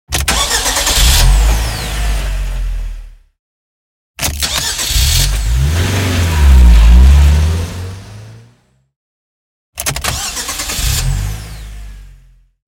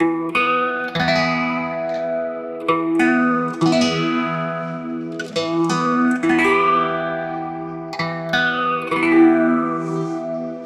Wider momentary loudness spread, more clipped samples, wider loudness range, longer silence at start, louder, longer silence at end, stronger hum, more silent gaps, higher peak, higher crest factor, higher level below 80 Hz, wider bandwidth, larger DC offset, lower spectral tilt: first, 19 LU vs 11 LU; neither; first, 9 LU vs 1 LU; about the same, 0.1 s vs 0 s; first, -13 LUFS vs -19 LUFS; first, 0.6 s vs 0 s; neither; first, 3.39-4.14 s, 8.96-9.73 s vs none; first, 0 dBFS vs -4 dBFS; about the same, 12 dB vs 16 dB; first, -14 dBFS vs -56 dBFS; first, 17 kHz vs 11 kHz; neither; second, -3 dB/octave vs -5.5 dB/octave